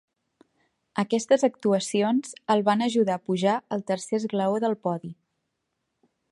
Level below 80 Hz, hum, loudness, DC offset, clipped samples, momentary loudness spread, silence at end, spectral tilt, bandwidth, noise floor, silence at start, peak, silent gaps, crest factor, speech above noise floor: -74 dBFS; none; -25 LUFS; under 0.1%; under 0.1%; 8 LU; 1.2 s; -5.5 dB/octave; 11.5 kHz; -79 dBFS; 0.95 s; -8 dBFS; none; 18 dB; 55 dB